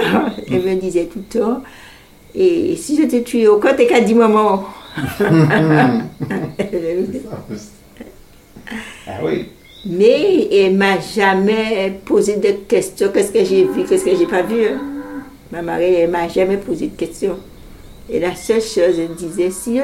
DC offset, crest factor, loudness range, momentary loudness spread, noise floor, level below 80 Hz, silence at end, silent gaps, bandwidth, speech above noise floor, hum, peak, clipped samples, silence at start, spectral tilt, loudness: under 0.1%; 16 dB; 6 LU; 16 LU; -41 dBFS; -46 dBFS; 0 s; none; 16 kHz; 26 dB; none; 0 dBFS; under 0.1%; 0 s; -6 dB/octave; -16 LUFS